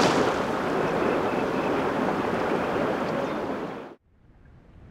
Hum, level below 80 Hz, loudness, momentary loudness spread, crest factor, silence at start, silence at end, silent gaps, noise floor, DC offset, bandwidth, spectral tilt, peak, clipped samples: none; -52 dBFS; -26 LUFS; 7 LU; 18 dB; 0 s; 0 s; none; -56 dBFS; under 0.1%; 16 kHz; -5.5 dB/octave; -8 dBFS; under 0.1%